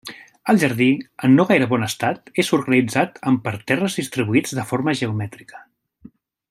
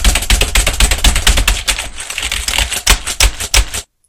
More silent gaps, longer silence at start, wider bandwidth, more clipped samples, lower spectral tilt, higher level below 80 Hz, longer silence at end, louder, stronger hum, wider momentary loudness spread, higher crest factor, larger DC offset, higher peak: neither; about the same, 0.05 s vs 0 s; second, 15 kHz vs over 20 kHz; second, under 0.1% vs 0.3%; first, -5.5 dB/octave vs -1.5 dB/octave; second, -62 dBFS vs -16 dBFS; first, 0.9 s vs 0.25 s; second, -19 LUFS vs -13 LUFS; neither; about the same, 8 LU vs 7 LU; about the same, 18 dB vs 14 dB; neither; about the same, -2 dBFS vs 0 dBFS